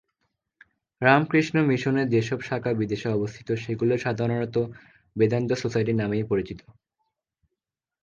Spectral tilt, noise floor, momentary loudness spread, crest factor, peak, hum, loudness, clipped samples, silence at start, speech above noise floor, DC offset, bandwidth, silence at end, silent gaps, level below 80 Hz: -7 dB/octave; -86 dBFS; 9 LU; 24 dB; -2 dBFS; none; -25 LUFS; under 0.1%; 1 s; 62 dB; under 0.1%; 7.4 kHz; 1.4 s; none; -58 dBFS